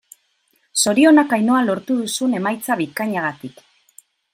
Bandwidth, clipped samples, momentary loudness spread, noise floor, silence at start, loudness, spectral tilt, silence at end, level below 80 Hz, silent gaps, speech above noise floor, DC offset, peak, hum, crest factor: 16.5 kHz; under 0.1%; 12 LU; -64 dBFS; 0.75 s; -18 LUFS; -3.5 dB/octave; 0.85 s; -68 dBFS; none; 47 dB; under 0.1%; -2 dBFS; none; 16 dB